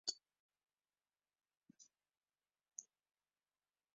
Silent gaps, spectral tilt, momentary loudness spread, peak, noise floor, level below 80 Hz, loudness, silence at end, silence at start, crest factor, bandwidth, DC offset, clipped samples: 0.40-0.49 s; 1 dB/octave; 17 LU; -26 dBFS; under -90 dBFS; under -90 dBFS; -53 LUFS; 1.15 s; 0.05 s; 34 dB; 7.4 kHz; under 0.1%; under 0.1%